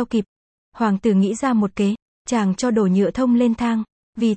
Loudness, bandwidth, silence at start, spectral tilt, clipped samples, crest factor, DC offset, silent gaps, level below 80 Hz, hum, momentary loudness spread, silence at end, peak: -20 LUFS; 8.8 kHz; 0 s; -6.5 dB/octave; under 0.1%; 12 dB; under 0.1%; 0.28-0.72 s, 2.02-2.25 s, 3.92-4.13 s; -52 dBFS; none; 7 LU; 0 s; -6 dBFS